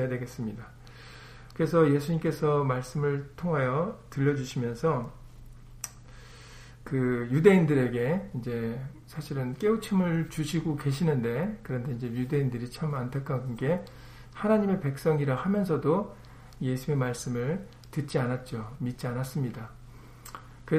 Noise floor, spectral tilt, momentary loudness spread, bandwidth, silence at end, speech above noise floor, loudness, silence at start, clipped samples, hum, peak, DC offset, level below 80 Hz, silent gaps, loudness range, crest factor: -48 dBFS; -7.5 dB/octave; 20 LU; 15.5 kHz; 0 s; 20 dB; -29 LUFS; 0 s; under 0.1%; none; -6 dBFS; under 0.1%; -52 dBFS; none; 5 LU; 22 dB